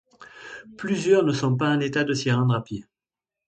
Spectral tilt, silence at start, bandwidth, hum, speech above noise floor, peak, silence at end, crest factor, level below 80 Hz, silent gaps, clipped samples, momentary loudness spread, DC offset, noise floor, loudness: -6 dB/octave; 0.2 s; 9 kHz; none; 67 dB; -8 dBFS; 0.65 s; 18 dB; -62 dBFS; none; under 0.1%; 20 LU; under 0.1%; -90 dBFS; -23 LUFS